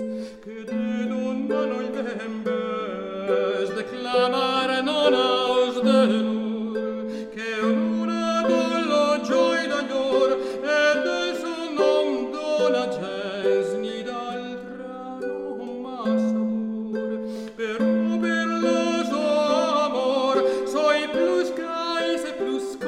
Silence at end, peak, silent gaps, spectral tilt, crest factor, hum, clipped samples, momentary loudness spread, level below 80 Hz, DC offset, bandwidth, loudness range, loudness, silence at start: 0 s; -6 dBFS; none; -4.5 dB/octave; 16 dB; none; under 0.1%; 10 LU; -64 dBFS; under 0.1%; 12 kHz; 6 LU; -24 LUFS; 0 s